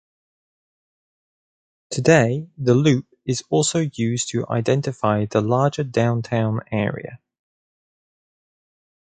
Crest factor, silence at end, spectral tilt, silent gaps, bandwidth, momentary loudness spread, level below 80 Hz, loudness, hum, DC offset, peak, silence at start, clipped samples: 20 dB; 1.85 s; -5.5 dB/octave; none; 9.6 kHz; 9 LU; -56 dBFS; -21 LUFS; none; under 0.1%; -2 dBFS; 1.9 s; under 0.1%